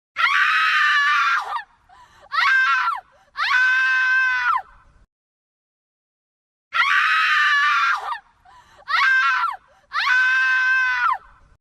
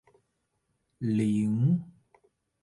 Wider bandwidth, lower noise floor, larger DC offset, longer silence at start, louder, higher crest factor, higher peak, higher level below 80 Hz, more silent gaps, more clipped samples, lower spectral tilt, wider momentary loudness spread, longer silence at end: first, 15 kHz vs 11.5 kHz; second, -51 dBFS vs -78 dBFS; neither; second, 0.15 s vs 1 s; first, -18 LUFS vs -28 LUFS; about the same, 14 dB vs 14 dB; first, -6 dBFS vs -16 dBFS; first, -62 dBFS vs -68 dBFS; first, 5.12-6.71 s vs none; neither; second, 2.5 dB/octave vs -9 dB/octave; first, 11 LU vs 5 LU; second, 0.45 s vs 0.7 s